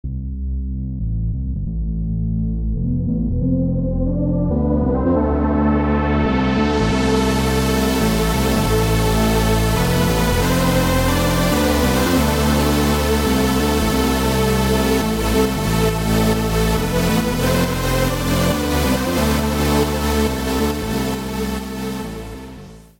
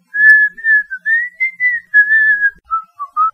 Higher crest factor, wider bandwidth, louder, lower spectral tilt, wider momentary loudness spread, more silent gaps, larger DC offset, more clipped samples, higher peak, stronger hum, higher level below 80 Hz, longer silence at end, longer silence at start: about the same, 12 dB vs 14 dB; first, 17 kHz vs 9.2 kHz; second, -18 LUFS vs -11 LUFS; first, -5.5 dB/octave vs -0.5 dB/octave; second, 8 LU vs 14 LU; neither; neither; neither; second, -4 dBFS vs 0 dBFS; neither; first, -24 dBFS vs -60 dBFS; first, 0.2 s vs 0.05 s; about the same, 0.05 s vs 0.15 s